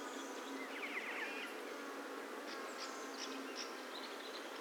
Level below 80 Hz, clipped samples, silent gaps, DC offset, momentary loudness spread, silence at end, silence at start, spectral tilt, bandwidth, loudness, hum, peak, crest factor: under -90 dBFS; under 0.1%; none; under 0.1%; 4 LU; 0 s; 0 s; -1 dB/octave; 19.5 kHz; -45 LUFS; none; -30 dBFS; 16 dB